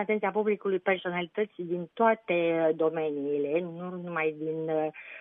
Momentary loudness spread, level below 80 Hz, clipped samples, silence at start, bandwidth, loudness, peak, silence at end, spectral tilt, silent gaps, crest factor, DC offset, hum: 8 LU; -78 dBFS; under 0.1%; 0 s; 3.8 kHz; -29 LUFS; -10 dBFS; 0 s; -9.5 dB/octave; none; 20 dB; under 0.1%; none